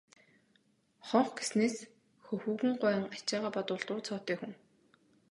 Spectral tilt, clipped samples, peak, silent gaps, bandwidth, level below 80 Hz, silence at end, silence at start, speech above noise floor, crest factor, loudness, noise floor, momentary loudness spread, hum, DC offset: -4.5 dB/octave; under 0.1%; -12 dBFS; none; 11.5 kHz; -82 dBFS; 0.75 s; 1.05 s; 38 dB; 22 dB; -34 LUFS; -72 dBFS; 12 LU; none; under 0.1%